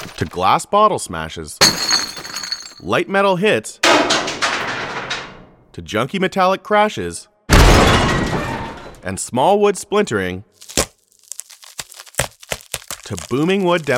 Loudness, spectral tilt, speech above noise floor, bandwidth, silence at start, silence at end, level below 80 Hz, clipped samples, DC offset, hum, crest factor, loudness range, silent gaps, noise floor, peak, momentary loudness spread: -17 LUFS; -3.5 dB/octave; 24 dB; 18.5 kHz; 0 s; 0 s; -28 dBFS; under 0.1%; under 0.1%; none; 18 dB; 7 LU; none; -41 dBFS; 0 dBFS; 17 LU